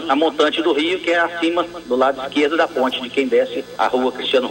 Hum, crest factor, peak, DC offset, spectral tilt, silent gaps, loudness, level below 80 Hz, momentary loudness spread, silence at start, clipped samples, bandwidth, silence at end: none; 16 dB; -2 dBFS; under 0.1%; -3.5 dB/octave; none; -18 LUFS; -58 dBFS; 4 LU; 0 s; under 0.1%; 16 kHz; 0 s